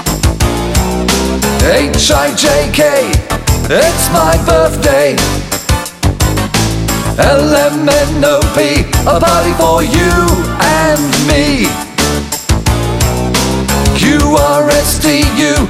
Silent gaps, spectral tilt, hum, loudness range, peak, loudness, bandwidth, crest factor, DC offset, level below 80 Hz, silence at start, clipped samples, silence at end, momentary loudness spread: none; -4.5 dB/octave; none; 2 LU; 0 dBFS; -10 LUFS; 16.5 kHz; 10 dB; under 0.1%; -18 dBFS; 0 s; under 0.1%; 0 s; 4 LU